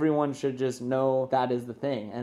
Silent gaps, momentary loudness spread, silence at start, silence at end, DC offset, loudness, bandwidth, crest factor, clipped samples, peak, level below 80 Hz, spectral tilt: none; 6 LU; 0 s; 0 s; under 0.1%; -28 LUFS; 12.5 kHz; 16 dB; under 0.1%; -12 dBFS; -72 dBFS; -7 dB/octave